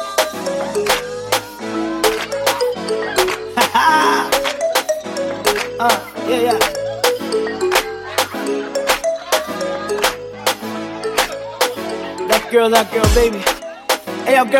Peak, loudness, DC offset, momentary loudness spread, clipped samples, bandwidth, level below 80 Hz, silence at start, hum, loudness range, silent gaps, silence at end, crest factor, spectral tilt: 0 dBFS; -17 LUFS; under 0.1%; 8 LU; under 0.1%; 16.5 kHz; -34 dBFS; 0 s; none; 3 LU; none; 0 s; 18 dB; -3 dB/octave